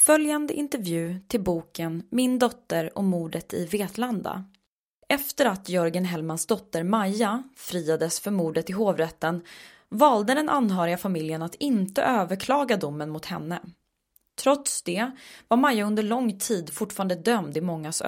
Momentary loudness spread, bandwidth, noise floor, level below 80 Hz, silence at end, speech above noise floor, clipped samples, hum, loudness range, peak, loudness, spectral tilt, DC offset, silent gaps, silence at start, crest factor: 10 LU; 16.5 kHz; -69 dBFS; -62 dBFS; 0 s; 44 dB; under 0.1%; none; 3 LU; -4 dBFS; -26 LUFS; -4.5 dB/octave; under 0.1%; 4.67-5.02 s; 0 s; 22 dB